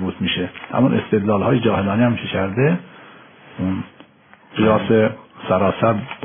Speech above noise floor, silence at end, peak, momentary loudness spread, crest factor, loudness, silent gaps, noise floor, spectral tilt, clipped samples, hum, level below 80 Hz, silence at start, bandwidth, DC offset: 32 dB; 0 s; -4 dBFS; 9 LU; 16 dB; -19 LUFS; none; -49 dBFS; -5.5 dB/octave; under 0.1%; none; -52 dBFS; 0 s; 3.6 kHz; under 0.1%